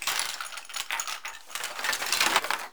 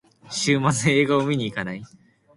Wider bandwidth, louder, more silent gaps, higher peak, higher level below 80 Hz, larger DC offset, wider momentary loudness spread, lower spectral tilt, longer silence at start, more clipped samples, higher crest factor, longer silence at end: first, over 20 kHz vs 11.5 kHz; second, -28 LUFS vs -22 LUFS; neither; first, -2 dBFS vs -6 dBFS; second, -70 dBFS vs -58 dBFS; first, 0.4% vs under 0.1%; about the same, 12 LU vs 13 LU; second, 1.5 dB/octave vs -4.5 dB/octave; second, 0 s vs 0.25 s; neither; first, 28 dB vs 18 dB; second, 0 s vs 0.5 s